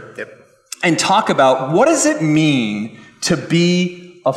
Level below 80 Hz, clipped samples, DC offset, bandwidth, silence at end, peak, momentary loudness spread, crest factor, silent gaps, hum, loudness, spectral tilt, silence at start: -58 dBFS; under 0.1%; under 0.1%; 14 kHz; 0 s; -4 dBFS; 17 LU; 14 dB; none; none; -15 LUFS; -4.5 dB/octave; 0 s